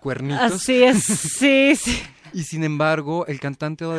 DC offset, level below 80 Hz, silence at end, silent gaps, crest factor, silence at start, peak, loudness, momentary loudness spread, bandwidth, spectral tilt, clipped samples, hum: under 0.1%; -46 dBFS; 0 s; none; 16 dB; 0.05 s; -4 dBFS; -19 LUFS; 13 LU; 11 kHz; -4 dB/octave; under 0.1%; none